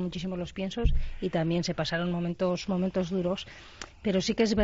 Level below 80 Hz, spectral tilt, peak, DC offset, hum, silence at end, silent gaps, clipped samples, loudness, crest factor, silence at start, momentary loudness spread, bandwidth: -36 dBFS; -6 dB/octave; -12 dBFS; under 0.1%; none; 0 s; none; under 0.1%; -30 LUFS; 16 dB; 0 s; 7 LU; 7.8 kHz